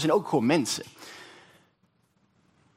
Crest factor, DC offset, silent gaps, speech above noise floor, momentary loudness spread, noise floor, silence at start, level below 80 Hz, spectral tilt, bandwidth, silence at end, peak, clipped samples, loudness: 22 dB; under 0.1%; none; 43 dB; 22 LU; -69 dBFS; 0 s; -74 dBFS; -4.5 dB/octave; 16 kHz; 1.5 s; -8 dBFS; under 0.1%; -26 LUFS